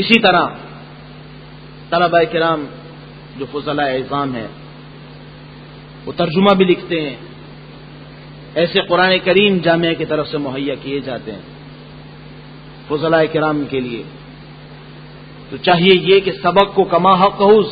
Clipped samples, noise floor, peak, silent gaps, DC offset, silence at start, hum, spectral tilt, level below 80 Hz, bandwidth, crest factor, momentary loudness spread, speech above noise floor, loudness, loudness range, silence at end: under 0.1%; -36 dBFS; 0 dBFS; none; under 0.1%; 0 s; none; -8 dB/octave; -48 dBFS; 5.4 kHz; 16 dB; 25 LU; 22 dB; -15 LUFS; 7 LU; 0 s